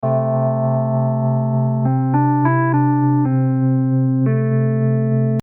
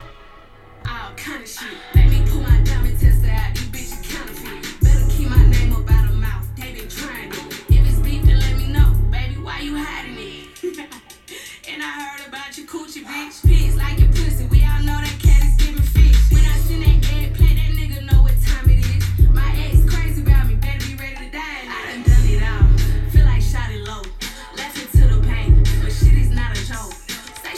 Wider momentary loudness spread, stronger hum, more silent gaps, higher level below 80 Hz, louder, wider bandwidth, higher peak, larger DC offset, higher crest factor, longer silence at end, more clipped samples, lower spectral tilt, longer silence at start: second, 2 LU vs 14 LU; neither; neither; second, -66 dBFS vs -16 dBFS; about the same, -17 LUFS vs -18 LUFS; second, 2.6 kHz vs 14 kHz; second, -4 dBFS vs 0 dBFS; neither; about the same, 12 dB vs 14 dB; about the same, 0 s vs 0 s; neither; first, -12 dB/octave vs -5.5 dB/octave; about the same, 0 s vs 0 s